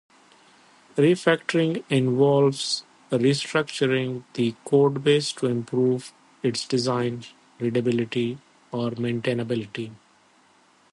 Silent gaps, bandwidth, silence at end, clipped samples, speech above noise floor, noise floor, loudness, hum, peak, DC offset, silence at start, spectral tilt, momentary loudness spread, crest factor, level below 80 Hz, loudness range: none; 11.5 kHz; 0.95 s; under 0.1%; 36 dB; -59 dBFS; -24 LUFS; none; -6 dBFS; under 0.1%; 0.95 s; -5.5 dB/octave; 11 LU; 18 dB; -68 dBFS; 6 LU